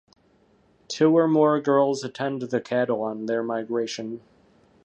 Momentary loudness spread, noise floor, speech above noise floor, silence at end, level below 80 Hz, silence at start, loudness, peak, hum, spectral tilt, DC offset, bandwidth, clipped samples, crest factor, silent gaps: 13 LU; -61 dBFS; 38 dB; 0.65 s; -72 dBFS; 0.9 s; -23 LUFS; -8 dBFS; none; -6 dB/octave; under 0.1%; 8.6 kHz; under 0.1%; 18 dB; none